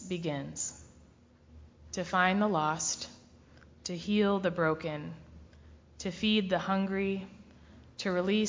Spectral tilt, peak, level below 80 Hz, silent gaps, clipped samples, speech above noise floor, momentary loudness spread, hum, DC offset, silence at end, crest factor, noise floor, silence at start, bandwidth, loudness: -4.5 dB/octave; -12 dBFS; -60 dBFS; none; under 0.1%; 29 dB; 15 LU; none; under 0.1%; 0 s; 20 dB; -60 dBFS; 0 s; 7.6 kHz; -31 LUFS